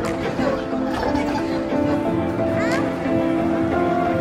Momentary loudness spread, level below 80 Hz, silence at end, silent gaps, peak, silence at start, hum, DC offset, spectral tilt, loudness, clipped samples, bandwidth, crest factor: 3 LU; -44 dBFS; 0 s; none; -8 dBFS; 0 s; none; under 0.1%; -7 dB/octave; -21 LUFS; under 0.1%; 14 kHz; 12 dB